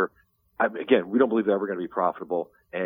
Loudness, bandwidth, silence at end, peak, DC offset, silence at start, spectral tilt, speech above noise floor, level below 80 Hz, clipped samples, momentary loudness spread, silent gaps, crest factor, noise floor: -25 LUFS; 3.9 kHz; 0 s; -4 dBFS; under 0.1%; 0 s; -9 dB/octave; 40 dB; -70 dBFS; under 0.1%; 9 LU; none; 20 dB; -65 dBFS